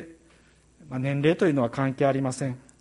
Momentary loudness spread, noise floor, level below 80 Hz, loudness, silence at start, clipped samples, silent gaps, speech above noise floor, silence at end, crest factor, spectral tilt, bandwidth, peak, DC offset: 10 LU; -58 dBFS; -62 dBFS; -25 LUFS; 0 s; under 0.1%; none; 34 dB; 0.2 s; 18 dB; -7 dB/octave; 11.5 kHz; -10 dBFS; under 0.1%